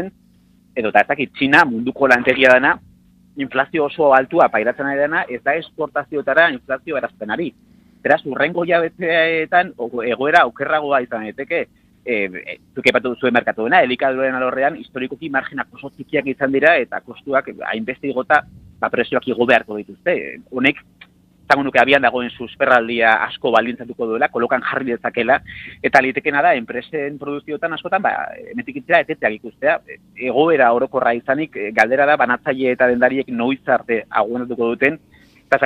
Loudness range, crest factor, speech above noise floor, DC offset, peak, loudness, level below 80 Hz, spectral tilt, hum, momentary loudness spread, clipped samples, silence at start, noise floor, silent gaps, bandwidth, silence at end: 4 LU; 18 dB; 35 dB; under 0.1%; 0 dBFS; -17 LUFS; -58 dBFS; -5.5 dB/octave; none; 12 LU; under 0.1%; 0 s; -53 dBFS; none; 11.5 kHz; 0 s